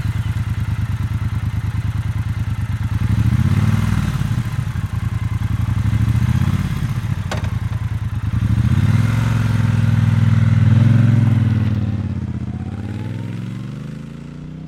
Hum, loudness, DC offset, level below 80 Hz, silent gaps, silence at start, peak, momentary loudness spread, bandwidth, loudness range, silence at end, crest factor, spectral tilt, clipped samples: none; -19 LUFS; under 0.1%; -30 dBFS; none; 0 s; -4 dBFS; 12 LU; 13 kHz; 5 LU; 0 s; 14 dB; -7.5 dB/octave; under 0.1%